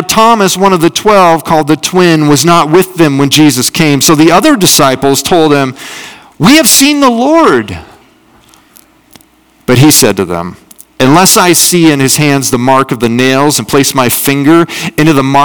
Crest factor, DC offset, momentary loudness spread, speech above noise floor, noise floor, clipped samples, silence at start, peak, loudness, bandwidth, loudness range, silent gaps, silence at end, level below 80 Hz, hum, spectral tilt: 8 dB; 1%; 7 LU; 38 dB; -45 dBFS; 8%; 0 s; 0 dBFS; -6 LUFS; over 20 kHz; 4 LU; none; 0 s; -40 dBFS; none; -4 dB/octave